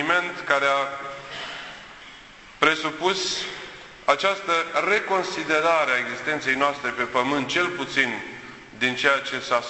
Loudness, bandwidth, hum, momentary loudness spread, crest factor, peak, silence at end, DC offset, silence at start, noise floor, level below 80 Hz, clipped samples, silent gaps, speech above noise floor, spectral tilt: -23 LUFS; 8.4 kHz; none; 16 LU; 22 dB; -2 dBFS; 0 s; under 0.1%; 0 s; -46 dBFS; -60 dBFS; under 0.1%; none; 22 dB; -2.5 dB/octave